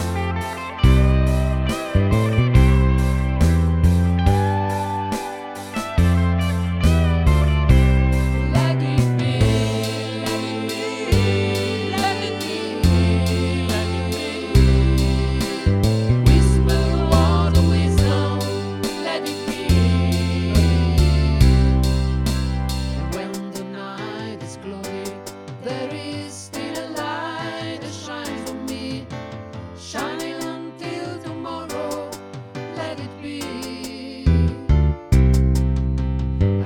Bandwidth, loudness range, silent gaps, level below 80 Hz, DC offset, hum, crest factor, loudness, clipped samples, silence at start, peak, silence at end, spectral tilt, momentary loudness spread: 15.5 kHz; 12 LU; none; -24 dBFS; under 0.1%; none; 16 dB; -20 LUFS; under 0.1%; 0 s; -2 dBFS; 0 s; -6.5 dB/octave; 14 LU